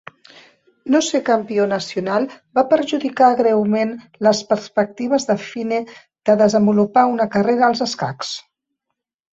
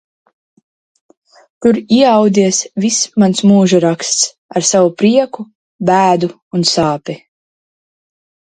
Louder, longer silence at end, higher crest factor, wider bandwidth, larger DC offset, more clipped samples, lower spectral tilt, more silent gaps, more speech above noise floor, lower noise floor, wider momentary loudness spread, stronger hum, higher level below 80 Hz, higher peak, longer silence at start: second, -18 LUFS vs -12 LUFS; second, 0.95 s vs 1.4 s; about the same, 16 dB vs 14 dB; second, 8 kHz vs 9.6 kHz; neither; neither; about the same, -5 dB/octave vs -4.5 dB/octave; second, none vs 4.38-4.49 s, 5.55-5.79 s, 6.42-6.51 s; second, 62 dB vs over 78 dB; second, -79 dBFS vs under -90 dBFS; about the same, 10 LU vs 11 LU; neither; second, -62 dBFS vs -56 dBFS; about the same, -2 dBFS vs 0 dBFS; second, 0.85 s vs 1.6 s